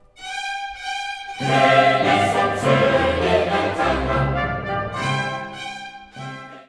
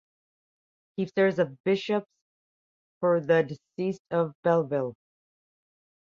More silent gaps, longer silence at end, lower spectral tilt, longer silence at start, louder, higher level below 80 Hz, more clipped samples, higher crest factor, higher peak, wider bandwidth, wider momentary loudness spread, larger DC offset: second, none vs 1.60-1.64 s, 2.22-3.01 s, 3.99-4.05 s, 4.35-4.43 s; second, 0.05 s vs 1.2 s; second, -5.5 dB/octave vs -7.5 dB/octave; second, 0.2 s vs 1 s; first, -20 LUFS vs -27 LUFS; first, -38 dBFS vs -74 dBFS; neither; about the same, 20 dB vs 20 dB; first, -2 dBFS vs -10 dBFS; first, 11 kHz vs 7.2 kHz; first, 16 LU vs 9 LU; neither